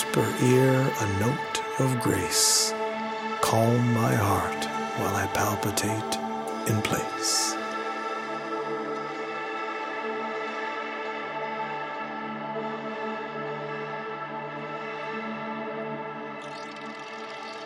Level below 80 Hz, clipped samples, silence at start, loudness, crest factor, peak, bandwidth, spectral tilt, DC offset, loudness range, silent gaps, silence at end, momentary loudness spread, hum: -62 dBFS; under 0.1%; 0 s; -28 LUFS; 22 dB; -6 dBFS; 16.5 kHz; -4 dB/octave; under 0.1%; 10 LU; none; 0 s; 12 LU; none